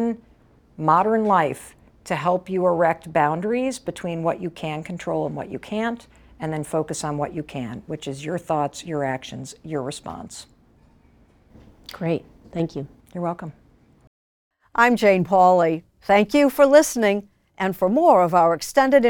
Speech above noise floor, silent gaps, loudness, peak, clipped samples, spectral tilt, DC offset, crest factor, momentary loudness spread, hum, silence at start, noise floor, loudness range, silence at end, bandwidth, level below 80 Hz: 35 dB; 14.07-14.51 s; -21 LUFS; -2 dBFS; under 0.1%; -5.5 dB/octave; under 0.1%; 20 dB; 17 LU; none; 0 s; -55 dBFS; 14 LU; 0 s; 19 kHz; -56 dBFS